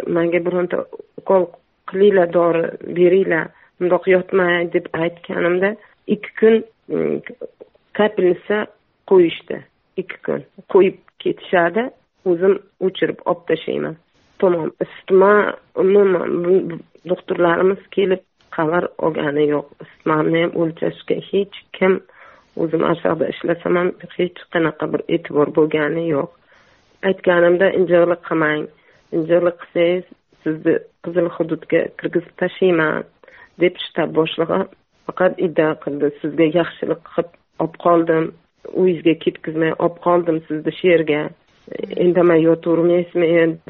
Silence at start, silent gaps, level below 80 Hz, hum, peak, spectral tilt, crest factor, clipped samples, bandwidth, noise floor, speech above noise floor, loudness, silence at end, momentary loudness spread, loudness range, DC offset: 0 s; none; -62 dBFS; none; -2 dBFS; -5 dB/octave; 16 dB; under 0.1%; 4.1 kHz; -53 dBFS; 36 dB; -18 LUFS; 0.15 s; 12 LU; 3 LU; under 0.1%